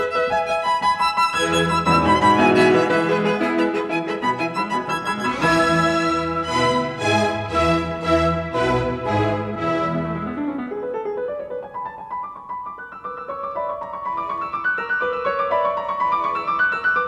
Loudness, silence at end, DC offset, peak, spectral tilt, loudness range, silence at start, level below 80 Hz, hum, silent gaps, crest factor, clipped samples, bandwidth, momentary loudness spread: -20 LUFS; 0 s; under 0.1%; -4 dBFS; -5 dB/octave; 11 LU; 0 s; -44 dBFS; none; none; 16 dB; under 0.1%; 13.5 kHz; 13 LU